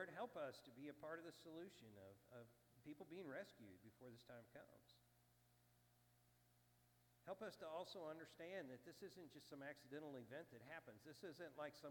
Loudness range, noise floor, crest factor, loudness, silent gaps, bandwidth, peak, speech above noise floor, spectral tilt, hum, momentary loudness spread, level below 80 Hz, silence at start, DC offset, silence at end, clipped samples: 8 LU; -78 dBFS; 20 dB; -58 LUFS; none; 18 kHz; -40 dBFS; 20 dB; -5 dB/octave; 60 Hz at -80 dBFS; 12 LU; under -90 dBFS; 0 s; under 0.1%; 0 s; under 0.1%